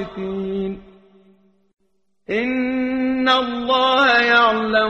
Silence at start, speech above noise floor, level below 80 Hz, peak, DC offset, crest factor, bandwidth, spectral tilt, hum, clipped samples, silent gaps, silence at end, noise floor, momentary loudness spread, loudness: 0 s; 52 dB; -52 dBFS; -2 dBFS; under 0.1%; 18 dB; 8.2 kHz; -5 dB/octave; none; under 0.1%; none; 0 s; -69 dBFS; 13 LU; -18 LUFS